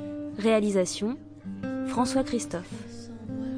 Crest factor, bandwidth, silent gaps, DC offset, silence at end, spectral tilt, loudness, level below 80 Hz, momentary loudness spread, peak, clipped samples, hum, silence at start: 18 dB; 10.5 kHz; none; under 0.1%; 0 s; -5 dB/octave; -28 LUFS; -56 dBFS; 17 LU; -10 dBFS; under 0.1%; none; 0 s